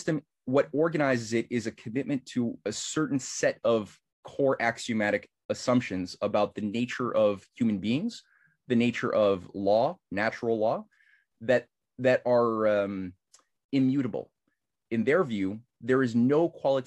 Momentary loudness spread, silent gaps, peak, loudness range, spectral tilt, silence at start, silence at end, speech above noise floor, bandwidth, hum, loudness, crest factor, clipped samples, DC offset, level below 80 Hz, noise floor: 9 LU; 4.13-4.23 s, 5.45-5.49 s, 13.65-13.69 s; -10 dBFS; 2 LU; -5.5 dB/octave; 0 s; 0.05 s; 53 dB; 11.5 kHz; none; -28 LUFS; 18 dB; under 0.1%; under 0.1%; -70 dBFS; -80 dBFS